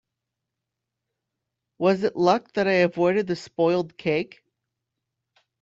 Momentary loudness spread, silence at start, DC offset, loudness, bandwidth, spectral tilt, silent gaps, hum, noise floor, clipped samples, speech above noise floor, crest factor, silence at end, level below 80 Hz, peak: 6 LU; 1.8 s; under 0.1%; -23 LUFS; 7.8 kHz; -6.5 dB/octave; none; none; -84 dBFS; under 0.1%; 62 dB; 20 dB; 1.35 s; -68 dBFS; -6 dBFS